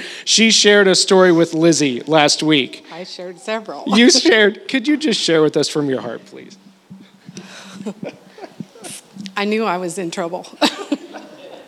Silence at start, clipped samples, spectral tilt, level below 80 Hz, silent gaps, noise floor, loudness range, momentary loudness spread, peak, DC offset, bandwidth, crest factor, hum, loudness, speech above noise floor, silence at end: 0 s; under 0.1%; -3 dB/octave; -72 dBFS; none; -42 dBFS; 14 LU; 23 LU; 0 dBFS; under 0.1%; 14 kHz; 16 dB; none; -15 LUFS; 27 dB; 0.1 s